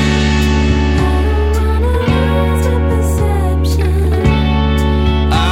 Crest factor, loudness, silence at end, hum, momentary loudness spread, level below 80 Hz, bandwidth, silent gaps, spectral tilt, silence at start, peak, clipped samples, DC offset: 12 dB; -14 LUFS; 0 s; none; 2 LU; -14 dBFS; 14 kHz; none; -6.5 dB/octave; 0 s; 0 dBFS; under 0.1%; under 0.1%